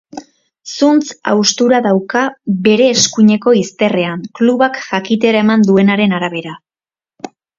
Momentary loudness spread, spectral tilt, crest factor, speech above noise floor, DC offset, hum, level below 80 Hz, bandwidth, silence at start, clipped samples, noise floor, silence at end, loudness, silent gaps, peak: 16 LU; -4.5 dB/octave; 14 dB; over 78 dB; under 0.1%; none; -58 dBFS; 7.6 kHz; 0.15 s; under 0.1%; under -90 dBFS; 0.3 s; -12 LUFS; none; 0 dBFS